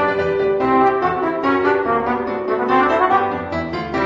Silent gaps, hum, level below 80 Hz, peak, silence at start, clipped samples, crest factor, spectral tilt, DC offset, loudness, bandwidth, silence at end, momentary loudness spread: none; none; -46 dBFS; -2 dBFS; 0 s; under 0.1%; 14 dB; -7 dB/octave; under 0.1%; -18 LUFS; 7.4 kHz; 0 s; 7 LU